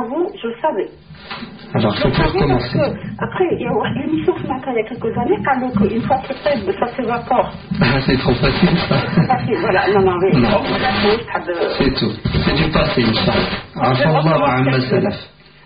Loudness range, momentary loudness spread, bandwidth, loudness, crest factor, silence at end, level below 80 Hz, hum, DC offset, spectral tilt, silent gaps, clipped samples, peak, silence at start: 4 LU; 8 LU; 5.2 kHz; -17 LUFS; 16 dB; 0.4 s; -34 dBFS; none; 0.2%; -5 dB/octave; none; under 0.1%; -2 dBFS; 0 s